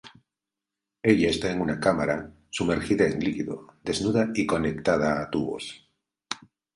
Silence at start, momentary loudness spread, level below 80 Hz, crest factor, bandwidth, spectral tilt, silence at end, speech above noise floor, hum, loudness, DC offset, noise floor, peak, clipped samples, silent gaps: 0.05 s; 13 LU; -50 dBFS; 22 dB; 11.5 kHz; -5.5 dB/octave; 0.4 s; 63 dB; none; -26 LUFS; under 0.1%; -88 dBFS; -4 dBFS; under 0.1%; none